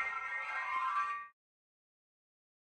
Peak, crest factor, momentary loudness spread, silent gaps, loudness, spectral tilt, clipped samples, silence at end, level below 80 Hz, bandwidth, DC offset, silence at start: -24 dBFS; 16 dB; 8 LU; none; -37 LUFS; 0 dB/octave; under 0.1%; 1.45 s; -82 dBFS; 10 kHz; under 0.1%; 0 s